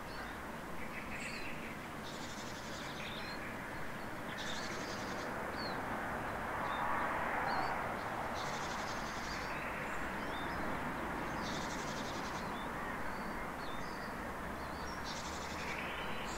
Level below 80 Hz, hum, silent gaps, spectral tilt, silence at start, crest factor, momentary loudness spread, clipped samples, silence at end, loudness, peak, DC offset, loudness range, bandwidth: -56 dBFS; none; none; -4 dB/octave; 0 s; 16 dB; 7 LU; under 0.1%; 0 s; -41 LUFS; -24 dBFS; 0.1%; 5 LU; 16 kHz